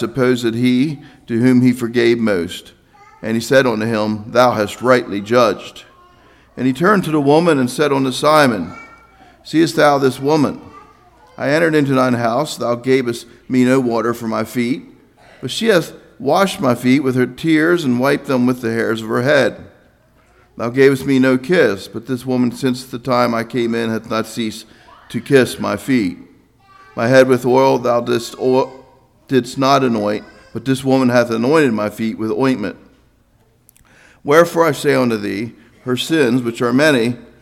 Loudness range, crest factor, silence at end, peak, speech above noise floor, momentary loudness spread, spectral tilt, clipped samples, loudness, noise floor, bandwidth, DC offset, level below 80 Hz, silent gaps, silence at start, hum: 3 LU; 16 dB; 0.2 s; 0 dBFS; 40 dB; 11 LU; -5.5 dB/octave; under 0.1%; -16 LUFS; -55 dBFS; 15.5 kHz; under 0.1%; -54 dBFS; none; 0 s; none